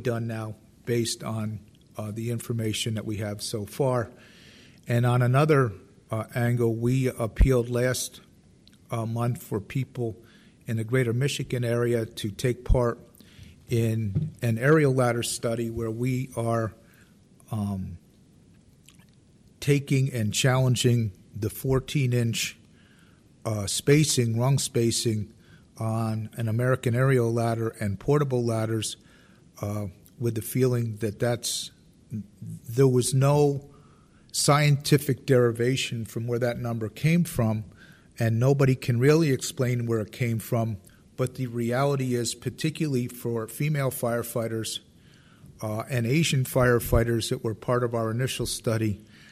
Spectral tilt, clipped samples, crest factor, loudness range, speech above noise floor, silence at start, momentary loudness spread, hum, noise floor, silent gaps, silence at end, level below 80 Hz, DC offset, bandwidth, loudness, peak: -5.5 dB/octave; under 0.1%; 18 dB; 6 LU; 32 dB; 0 s; 12 LU; none; -57 dBFS; none; 0.3 s; -42 dBFS; under 0.1%; 15.5 kHz; -26 LUFS; -8 dBFS